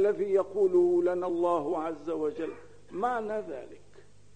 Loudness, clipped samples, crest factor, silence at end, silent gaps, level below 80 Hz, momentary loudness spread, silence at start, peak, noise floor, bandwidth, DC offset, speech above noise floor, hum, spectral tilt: -29 LUFS; under 0.1%; 14 dB; 0.6 s; none; -66 dBFS; 16 LU; 0 s; -14 dBFS; -58 dBFS; 9 kHz; 0.3%; 29 dB; 50 Hz at -60 dBFS; -7.5 dB/octave